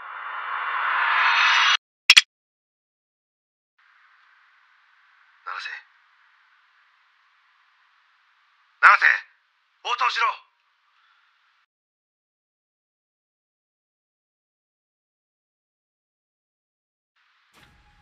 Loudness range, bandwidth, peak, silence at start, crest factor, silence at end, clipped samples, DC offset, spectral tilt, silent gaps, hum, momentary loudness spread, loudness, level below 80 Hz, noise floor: 22 LU; 15 kHz; 0 dBFS; 0 s; 28 dB; 7.65 s; under 0.1%; under 0.1%; 3.5 dB/octave; 1.78-2.09 s, 2.25-3.77 s; none; 22 LU; -18 LUFS; -76 dBFS; -66 dBFS